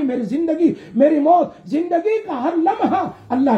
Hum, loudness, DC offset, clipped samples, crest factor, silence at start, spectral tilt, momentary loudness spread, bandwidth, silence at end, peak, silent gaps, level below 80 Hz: none; -18 LUFS; under 0.1%; under 0.1%; 14 dB; 0 s; -8 dB/octave; 7 LU; 8 kHz; 0 s; -2 dBFS; none; -62 dBFS